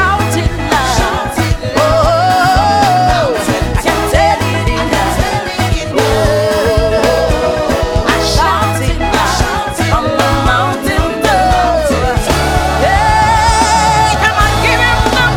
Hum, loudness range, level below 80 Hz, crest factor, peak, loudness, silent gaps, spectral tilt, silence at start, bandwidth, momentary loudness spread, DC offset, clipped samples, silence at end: none; 2 LU; -20 dBFS; 10 dB; 0 dBFS; -11 LUFS; none; -4.5 dB/octave; 0 s; 19.5 kHz; 5 LU; under 0.1%; under 0.1%; 0 s